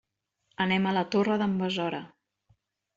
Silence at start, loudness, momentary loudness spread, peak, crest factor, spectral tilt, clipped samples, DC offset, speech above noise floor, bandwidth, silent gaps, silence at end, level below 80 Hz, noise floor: 0.6 s; -27 LUFS; 7 LU; -14 dBFS; 16 dB; -6.5 dB/octave; under 0.1%; under 0.1%; 48 dB; 7.6 kHz; none; 0.9 s; -68 dBFS; -75 dBFS